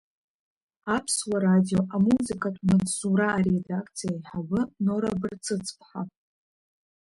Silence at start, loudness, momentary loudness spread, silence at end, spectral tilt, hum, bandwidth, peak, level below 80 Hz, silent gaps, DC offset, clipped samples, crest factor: 0.85 s; -26 LUFS; 13 LU; 0.9 s; -5.5 dB/octave; none; 11.5 kHz; -12 dBFS; -56 dBFS; none; under 0.1%; under 0.1%; 16 dB